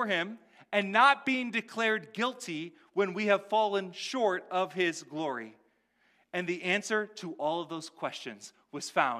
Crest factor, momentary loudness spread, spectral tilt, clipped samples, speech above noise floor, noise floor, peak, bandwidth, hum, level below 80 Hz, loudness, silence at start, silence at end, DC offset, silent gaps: 22 dB; 13 LU; -3.5 dB/octave; under 0.1%; 40 dB; -71 dBFS; -10 dBFS; 14.5 kHz; none; -88 dBFS; -31 LUFS; 0 s; 0 s; under 0.1%; none